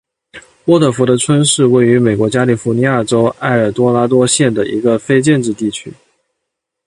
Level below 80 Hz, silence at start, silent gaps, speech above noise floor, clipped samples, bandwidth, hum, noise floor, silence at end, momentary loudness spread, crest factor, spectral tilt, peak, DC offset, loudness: -50 dBFS; 0.35 s; none; 64 dB; under 0.1%; 11.5 kHz; none; -76 dBFS; 0.95 s; 5 LU; 12 dB; -5 dB/octave; 0 dBFS; under 0.1%; -12 LUFS